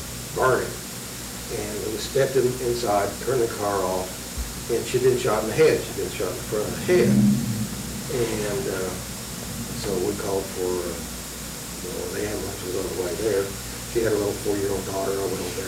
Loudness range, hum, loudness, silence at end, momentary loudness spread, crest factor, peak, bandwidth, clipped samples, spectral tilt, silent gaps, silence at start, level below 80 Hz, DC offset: 6 LU; none; -25 LUFS; 0 s; 11 LU; 16 dB; -10 dBFS; over 20 kHz; under 0.1%; -4.5 dB/octave; none; 0 s; -42 dBFS; under 0.1%